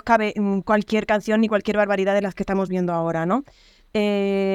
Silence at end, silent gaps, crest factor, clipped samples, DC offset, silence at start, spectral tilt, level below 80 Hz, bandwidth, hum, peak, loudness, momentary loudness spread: 0 s; none; 18 dB; under 0.1%; under 0.1%; 0.05 s; -6.5 dB/octave; -52 dBFS; 11.5 kHz; none; -4 dBFS; -22 LUFS; 5 LU